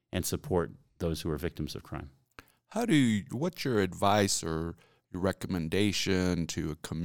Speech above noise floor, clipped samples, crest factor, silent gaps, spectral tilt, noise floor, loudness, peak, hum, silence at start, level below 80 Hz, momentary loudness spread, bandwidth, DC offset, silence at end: 27 dB; under 0.1%; 20 dB; none; -5 dB/octave; -57 dBFS; -31 LUFS; -12 dBFS; none; 0.1 s; -52 dBFS; 14 LU; 19 kHz; 0.1%; 0 s